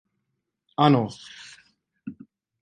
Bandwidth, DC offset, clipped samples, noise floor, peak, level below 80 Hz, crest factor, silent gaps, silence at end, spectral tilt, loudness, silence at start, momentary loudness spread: 9.4 kHz; under 0.1%; under 0.1%; -79 dBFS; -4 dBFS; -68 dBFS; 22 dB; none; 0.5 s; -7 dB/octave; -22 LUFS; 0.8 s; 23 LU